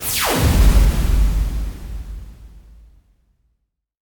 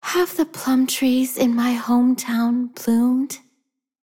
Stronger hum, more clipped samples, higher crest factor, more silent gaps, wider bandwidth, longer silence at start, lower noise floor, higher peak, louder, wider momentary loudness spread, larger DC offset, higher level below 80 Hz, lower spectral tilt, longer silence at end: neither; neither; about the same, 16 dB vs 12 dB; neither; first, 19.5 kHz vs 17 kHz; about the same, 0 s vs 0.05 s; about the same, -71 dBFS vs -72 dBFS; first, -2 dBFS vs -8 dBFS; about the same, -18 LUFS vs -20 LUFS; first, 19 LU vs 5 LU; neither; first, -20 dBFS vs -64 dBFS; about the same, -4.5 dB/octave vs -3.5 dB/octave; first, 1.5 s vs 0.65 s